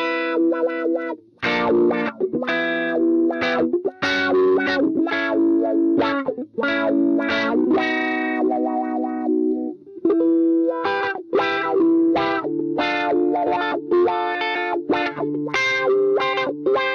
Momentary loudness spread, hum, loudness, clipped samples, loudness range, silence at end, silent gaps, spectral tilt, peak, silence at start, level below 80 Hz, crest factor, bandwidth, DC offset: 6 LU; none; -20 LUFS; under 0.1%; 2 LU; 0 s; none; -5.5 dB/octave; -8 dBFS; 0 s; -60 dBFS; 12 dB; 6.8 kHz; under 0.1%